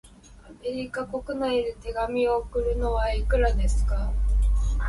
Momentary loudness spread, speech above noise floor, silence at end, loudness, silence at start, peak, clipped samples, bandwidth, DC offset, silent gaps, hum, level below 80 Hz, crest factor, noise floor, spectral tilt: 8 LU; 24 dB; 0 s; -27 LUFS; 0.05 s; -12 dBFS; under 0.1%; 11.5 kHz; under 0.1%; none; none; -26 dBFS; 14 dB; -48 dBFS; -6.5 dB/octave